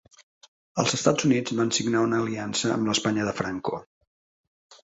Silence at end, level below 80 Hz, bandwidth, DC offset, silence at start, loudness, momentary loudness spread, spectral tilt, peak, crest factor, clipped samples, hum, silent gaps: 0.1 s; -62 dBFS; 8.2 kHz; under 0.1%; 0.75 s; -25 LUFS; 9 LU; -4 dB/octave; -6 dBFS; 22 dB; under 0.1%; none; 3.86-4.01 s, 4.07-4.70 s